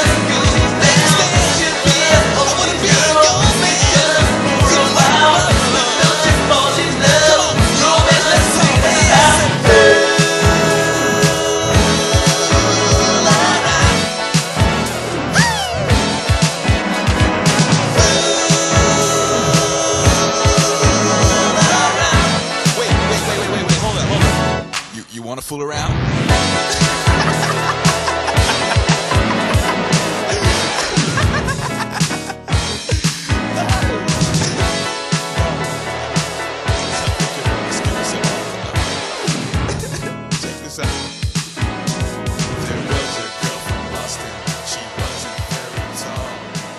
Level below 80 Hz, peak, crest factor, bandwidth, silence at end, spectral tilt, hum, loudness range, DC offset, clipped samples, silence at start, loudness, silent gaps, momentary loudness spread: -26 dBFS; 0 dBFS; 14 dB; 13 kHz; 0 s; -3.5 dB/octave; none; 10 LU; under 0.1%; under 0.1%; 0 s; -14 LUFS; none; 12 LU